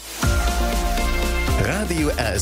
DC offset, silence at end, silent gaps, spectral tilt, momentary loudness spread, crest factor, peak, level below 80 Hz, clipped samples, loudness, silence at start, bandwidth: under 0.1%; 0 s; none; -4.5 dB/octave; 1 LU; 14 dB; -8 dBFS; -24 dBFS; under 0.1%; -22 LUFS; 0 s; 16 kHz